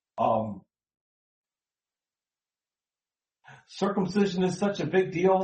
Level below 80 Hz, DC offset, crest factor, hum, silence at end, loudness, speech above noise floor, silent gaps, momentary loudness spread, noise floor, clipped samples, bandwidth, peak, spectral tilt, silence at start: -66 dBFS; under 0.1%; 20 dB; none; 0 s; -27 LUFS; over 64 dB; 1.01-1.44 s; 12 LU; under -90 dBFS; under 0.1%; 8.4 kHz; -10 dBFS; -6.5 dB/octave; 0.15 s